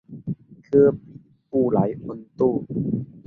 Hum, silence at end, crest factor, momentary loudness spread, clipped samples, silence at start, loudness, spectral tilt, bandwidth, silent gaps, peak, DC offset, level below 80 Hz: none; 0.1 s; 18 dB; 17 LU; under 0.1%; 0.1 s; -22 LUFS; -12 dB/octave; 2.5 kHz; none; -4 dBFS; under 0.1%; -56 dBFS